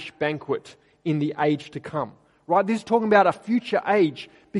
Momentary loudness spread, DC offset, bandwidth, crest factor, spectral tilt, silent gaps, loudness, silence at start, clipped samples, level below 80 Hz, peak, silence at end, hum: 12 LU; under 0.1%; 11.5 kHz; 20 dB; -7 dB/octave; none; -23 LUFS; 0 s; under 0.1%; -68 dBFS; -4 dBFS; 0 s; none